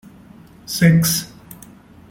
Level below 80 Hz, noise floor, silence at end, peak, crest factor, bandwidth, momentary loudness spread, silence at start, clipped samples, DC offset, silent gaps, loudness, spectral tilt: -48 dBFS; -44 dBFS; 0.55 s; -2 dBFS; 18 dB; 17 kHz; 26 LU; 0.7 s; under 0.1%; under 0.1%; none; -16 LUFS; -4.5 dB/octave